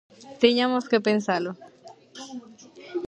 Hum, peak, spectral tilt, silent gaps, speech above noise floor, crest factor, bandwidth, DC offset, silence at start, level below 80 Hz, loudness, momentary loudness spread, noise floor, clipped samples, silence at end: none; -4 dBFS; -5 dB/octave; none; 24 dB; 22 dB; 8.8 kHz; under 0.1%; 0.2 s; -70 dBFS; -23 LUFS; 22 LU; -47 dBFS; under 0.1%; 0 s